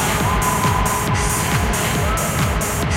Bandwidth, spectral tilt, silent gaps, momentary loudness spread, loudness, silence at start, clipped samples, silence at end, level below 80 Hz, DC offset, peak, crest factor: 17 kHz; -4 dB/octave; none; 2 LU; -18 LUFS; 0 s; under 0.1%; 0 s; -26 dBFS; under 0.1%; -4 dBFS; 14 dB